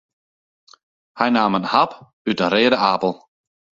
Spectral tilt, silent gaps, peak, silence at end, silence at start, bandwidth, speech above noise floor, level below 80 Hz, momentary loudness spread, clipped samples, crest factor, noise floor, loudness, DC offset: -6 dB/octave; 2.13-2.25 s; 0 dBFS; 0.65 s; 1.15 s; 7.6 kHz; over 72 dB; -62 dBFS; 9 LU; under 0.1%; 20 dB; under -90 dBFS; -19 LUFS; under 0.1%